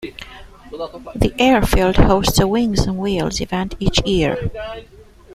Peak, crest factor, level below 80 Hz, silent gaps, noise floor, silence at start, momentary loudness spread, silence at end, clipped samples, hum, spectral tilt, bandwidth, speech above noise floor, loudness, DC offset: 0 dBFS; 18 dB; -26 dBFS; none; -39 dBFS; 0 s; 18 LU; 0 s; under 0.1%; none; -5 dB/octave; 16 kHz; 22 dB; -17 LUFS; under 0.1%